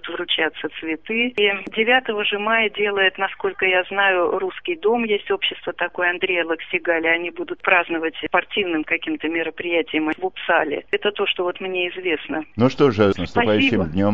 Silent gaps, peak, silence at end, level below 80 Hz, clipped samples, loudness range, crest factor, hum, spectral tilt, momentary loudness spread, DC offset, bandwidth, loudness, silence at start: none; -2 dBFS; 0 s; -54 dBFS; under 0.1%; 3 LU; 20 dB; none; -6.5 dB/octave; 7 LU; 0.4%; 7.4 kHz; -20 LUFS; 0.05 s